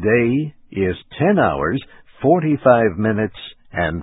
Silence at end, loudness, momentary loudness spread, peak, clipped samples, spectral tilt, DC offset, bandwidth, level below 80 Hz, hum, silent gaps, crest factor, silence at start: 0 s; -18 LUFS; 12 LU; 0 dBFS; under 0.1%; -12.5 dB/octave; under 0.1%; 4 kHz; -42 dBFS; none; none; 18 dB; 0 s